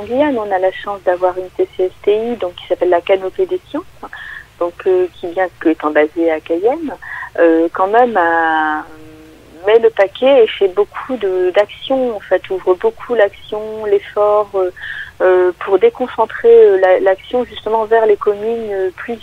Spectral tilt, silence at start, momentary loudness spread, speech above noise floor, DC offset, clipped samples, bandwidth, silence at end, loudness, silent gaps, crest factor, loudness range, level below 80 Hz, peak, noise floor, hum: -6 dB/octave; 0 s; 11 LU; 25 dB; under 0.1%; under 0.1%; 8.2 kHz; 0.05 s; -14 LUFS; none; 14 dB; 5 LU; -50 dBFS; 0 dBFS; -39 dBFS; none